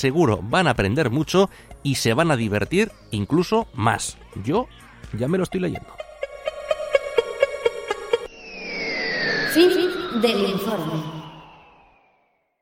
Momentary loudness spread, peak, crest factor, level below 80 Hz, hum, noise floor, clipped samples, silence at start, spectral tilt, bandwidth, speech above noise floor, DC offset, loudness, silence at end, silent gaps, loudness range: 13 LU; -2 dBFS; 20 dB; -48 dBFS; none; -66 dBFS; under 0.1%; 0 s; -5 dB/octave; 16.5 kHz; 45 dB; under 0.1%; -22 LUFS; 1.1 s; none; 5 LU